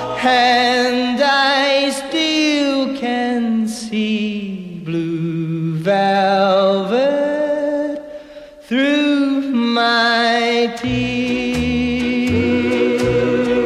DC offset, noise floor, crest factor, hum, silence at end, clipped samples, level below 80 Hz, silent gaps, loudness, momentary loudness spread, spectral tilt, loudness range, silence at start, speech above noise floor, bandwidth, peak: under 0.1%; -37 dBFS; 14 dB; none; 0 s; under 0.1%; -44 dBFS; none; -16 LUFS; 8 LU; -5 dB/octave; 3 LU; 0 s; 23 dB; 13 kHz; -2 dBFS